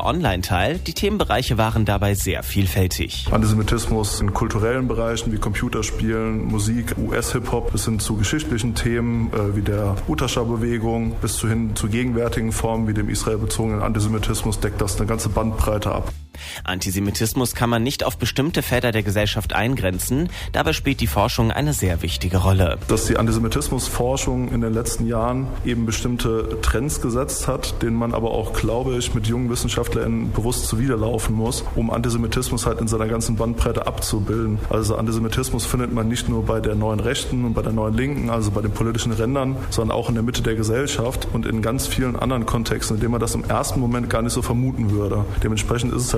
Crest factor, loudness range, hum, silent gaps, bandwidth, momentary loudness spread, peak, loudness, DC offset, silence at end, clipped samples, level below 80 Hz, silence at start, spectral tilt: 14 dB; 2 LU; none; none; 15.5 kHz; 3 LU; -6 dBFS; -22 LUFS; under 0.1%; 0 s; under 0.1%; -30 dBFS; 0 s; -5 dB/octave